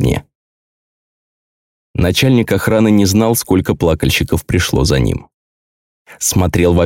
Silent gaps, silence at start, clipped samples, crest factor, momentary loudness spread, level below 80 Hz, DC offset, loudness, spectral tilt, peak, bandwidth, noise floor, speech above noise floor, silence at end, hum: 0.35-1.94 s, 5.34-6.05 s; 0 s; under 0.1%; 14 dB; 7 LU; -32 dBFS; under 0.1%; -14 LUFS; -5 dB/octave; -2 dBFS; 17 kHz; under -90 dBFS; over 77 dB; 0 s; none